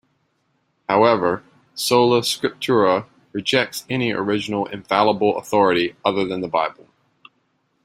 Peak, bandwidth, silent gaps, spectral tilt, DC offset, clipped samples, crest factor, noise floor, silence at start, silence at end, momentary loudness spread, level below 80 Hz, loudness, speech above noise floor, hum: -2 dBFS; 16 kHz; none; -4.5 dB/octave; under 0.1%; under 0.1%; 18 dB; -68 dBFS; 0.9 s; 1.15 s; 9 LU; -62 dBFS; -20 LUFS; 49 dB; none